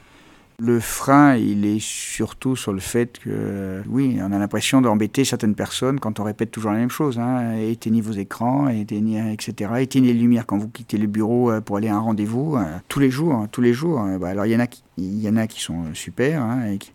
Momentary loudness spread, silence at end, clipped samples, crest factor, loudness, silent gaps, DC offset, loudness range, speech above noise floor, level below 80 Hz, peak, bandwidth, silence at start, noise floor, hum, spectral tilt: 9 LU; 0.1 s; under 0.1%; 20 dB; -21 LUFS; none; under 0.1%; 2 LU; 30 dB; -52 dBFS; -2 dBFS; 17 kHz; 0.6 s; -50 dBFS; none; -6 dB/octave